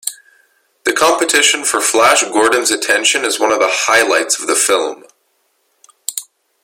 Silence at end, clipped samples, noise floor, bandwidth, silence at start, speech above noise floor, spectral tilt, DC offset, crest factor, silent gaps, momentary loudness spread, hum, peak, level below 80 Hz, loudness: 0.4 s; under 0.1%; -62 dBFS; 17 kHz; 0.05 s; 49 dB; 0.5 dB/octave; under 0.1%; 16 dB; none; 13 LU; none; 0 dBFS; -60 dBFS; -12 LUFS